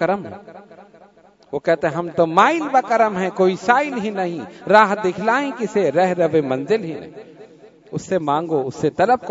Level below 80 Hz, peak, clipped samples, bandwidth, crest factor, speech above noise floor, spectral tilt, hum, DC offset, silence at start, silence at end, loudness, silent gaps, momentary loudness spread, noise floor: -62 dBFS; 0 dBFS; under 0.1%; 8 kHz; 20 dB; 32 dB; -6 dB/octave; none; under 0.1%; 0 s; 0 s; -18 LUFS; none; 16 LU; -50 dBFS